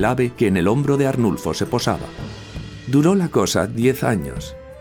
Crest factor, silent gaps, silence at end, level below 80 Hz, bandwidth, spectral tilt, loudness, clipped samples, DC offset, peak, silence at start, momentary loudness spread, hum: 16 dB; none; 0 s; -42 dBFS; 19 kHz; -6 dB/octave; -19 LUFS; under 0.1%; under 0.1%; -4 dBFS; 0 s; 16 LU; none